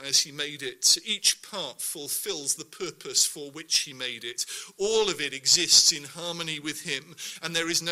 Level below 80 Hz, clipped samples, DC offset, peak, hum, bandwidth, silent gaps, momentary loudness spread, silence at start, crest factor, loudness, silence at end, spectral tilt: -68 dBFS; under 0.1%; under 0.1%; -4 dBFS; none; 16 kHz; none; 13 LU; 0 s; 24 dB; -25 LUFS; 0 s; 0 dB/octave